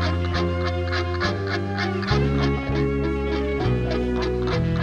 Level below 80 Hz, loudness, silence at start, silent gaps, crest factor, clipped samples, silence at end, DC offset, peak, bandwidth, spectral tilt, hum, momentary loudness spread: -32 dBFS; -24 LUFS; 0 s; none; 14 dB; under 0.1%; 0 s; under 0.1%; -8 dBFS; 8.2 kHz; -7 dB/octave; none; 3 LU